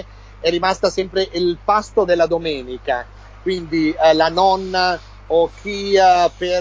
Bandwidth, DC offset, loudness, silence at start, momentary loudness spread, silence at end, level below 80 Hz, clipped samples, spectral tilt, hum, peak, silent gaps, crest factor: 8 kHz; under 0.1%; -18 LUFS; 0 s; 11 LU; 0 s; -40 dBFS; under 0.1%; -4.5 dB/octave; 50 Hz at -40 dBFS; -2 dBFS; none; 14 dB